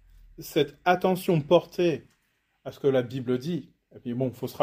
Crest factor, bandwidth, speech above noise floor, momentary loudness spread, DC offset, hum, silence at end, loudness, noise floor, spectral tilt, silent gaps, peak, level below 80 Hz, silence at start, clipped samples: 20 dB; 16 kHz; 46 dB; 15 LU; under 0.1%; none; 0 s; -27 LUFS; -72 dBFS; -6.5 dB/octave; none; -6 dBFS; -60 dBFS; 0.4 s; under 0.1%